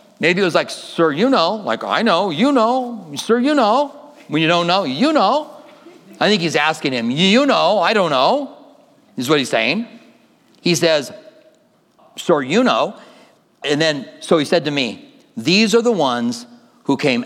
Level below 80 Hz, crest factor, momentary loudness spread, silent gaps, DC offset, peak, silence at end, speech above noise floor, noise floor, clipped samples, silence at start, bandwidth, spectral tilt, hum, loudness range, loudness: -72 dBFS; 18 dB; 12 LU; none; under 0.1%; 0 dBFS; 0 s; 39 dB; -56 dBFS; under 0.1%; 0.2 s; 15.5 kHz; -4.5 dB/octave; none; 4 LU; -17 LUFS